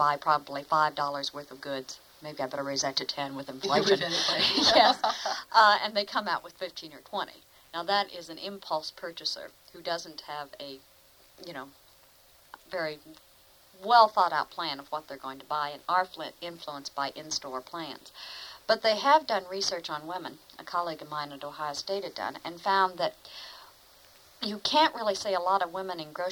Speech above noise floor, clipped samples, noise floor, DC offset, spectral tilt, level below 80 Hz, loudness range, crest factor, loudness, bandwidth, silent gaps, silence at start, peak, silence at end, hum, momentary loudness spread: 29 dB; under 0.1%; -59 dBFS; under 0.1%; -2.5 dB/octave; -70 dBFS; 13 LU; 24 dB; -28 LUFS; over 20 kHz; none; 0 s; -6 dBFS; 0 s; none; 19 LU